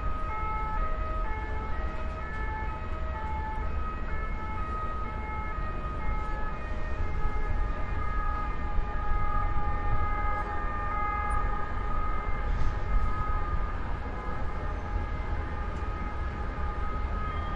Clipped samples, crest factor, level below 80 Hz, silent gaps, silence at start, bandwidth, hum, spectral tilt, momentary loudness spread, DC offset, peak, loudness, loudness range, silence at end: under 0.1%; 14 dB; -32 dBFS; none; 0 s; 5.8 kHz; none; -7.5 dB/octave; 4 LU; under 0.1%; -14 dBFS; -34 LUFS; 3 LU; 0 s